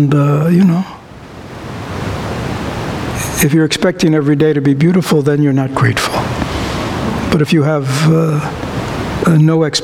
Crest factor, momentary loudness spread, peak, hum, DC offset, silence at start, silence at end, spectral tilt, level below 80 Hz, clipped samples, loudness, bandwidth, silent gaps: 14 dB; 11 LU; 0 dBFS; none; under 0.1%; 0 s; 0 s; -6 dB/octave; -34 dBFS; under 0.1%; -13 LUFS; 16 kHz; none